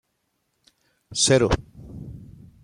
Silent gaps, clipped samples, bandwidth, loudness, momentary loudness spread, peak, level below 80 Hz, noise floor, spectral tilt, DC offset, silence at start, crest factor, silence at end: none; under 0.1%; 16 kHz; -21 LUFS; 24 LU; -4 dBFS; -40 dBFS; -74 dBFS; -3.5 dB/octave; under 0.1%; 1.1 s; 22 dB; 0.4 s